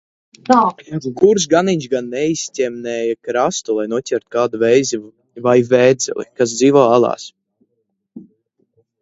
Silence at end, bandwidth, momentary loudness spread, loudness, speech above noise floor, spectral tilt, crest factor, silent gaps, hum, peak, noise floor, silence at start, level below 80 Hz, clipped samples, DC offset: 0.8 s; 8 kHz; 10 LU; -16 LUFS; 55 dB; -4.5 dB/octave; 16 dB; none; none; 0 dBFS; -70 dBFS; 0.5 s; -60 dBFS; under 0.1%; under 0.1%